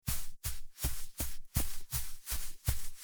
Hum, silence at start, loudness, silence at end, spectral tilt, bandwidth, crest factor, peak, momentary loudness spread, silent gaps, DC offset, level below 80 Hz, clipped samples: none; 0.05 s; -39 LUFS; 0 s; -3 dB/octave; over 20 kHz; 18 dB; -16 dBFS; 4 LU; none; under 0.1%; -40 dBFS; under 0.1%